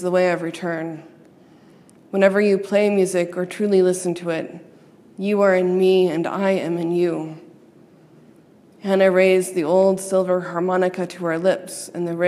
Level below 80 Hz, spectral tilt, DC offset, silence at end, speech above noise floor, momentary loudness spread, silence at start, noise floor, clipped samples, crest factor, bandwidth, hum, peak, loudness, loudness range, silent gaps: -76 dBFS; -6 dB/octave; under 0.1%; 0 s; 31 dB; 11 LU; 0 s; -50 dBFS; under 0.1%; 18 dB; 14 kHz; none; -2 dBFS; -20 LUFS; 2 LU; none